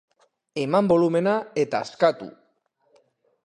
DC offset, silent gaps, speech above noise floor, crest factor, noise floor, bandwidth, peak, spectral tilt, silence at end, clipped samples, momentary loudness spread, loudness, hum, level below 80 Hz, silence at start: under 0.1%; none; 46 dB; 20 dB; -68 dBFS; 10.5 kHz; -4 dBFS; -6.5 dB/octave; 1.15 s; under 0.1%; 16 LU; -22 LUFS; none; -66 dBFS; 0.55 s